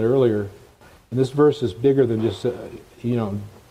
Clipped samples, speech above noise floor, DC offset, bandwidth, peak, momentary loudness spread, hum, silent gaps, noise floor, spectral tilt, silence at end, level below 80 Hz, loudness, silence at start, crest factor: under 0.1%; 29 dB; under 0.1%; 12.5 kHz; -6 dBFS; 15 LU; none; none; -49 dBFS; -8 dB/octave; 0.2 s; -56 dBFS; -21 LUFS; 0 s; 16 dB